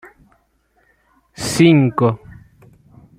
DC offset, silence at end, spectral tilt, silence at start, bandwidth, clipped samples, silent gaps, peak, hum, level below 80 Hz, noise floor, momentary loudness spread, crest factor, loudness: under 0.1%; 0.85 s; -6 dB/octave; 1.4 s; 15.5 kHz; under 0.1%; none; -2 dBFS; none; -52 dBFS; -61 dBFS; 15 LU; 18 dB; -15 LUFS